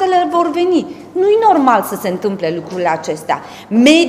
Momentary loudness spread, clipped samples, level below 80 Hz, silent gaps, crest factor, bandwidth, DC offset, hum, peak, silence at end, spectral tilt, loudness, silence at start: 10 LU; under 0.1%; -58 dBFS; none; 14 dB; 16 kHz; under 0.1%; none; 0 dBFS; 0 s; -4.5 dB/octave; -15 LUFS; 0 s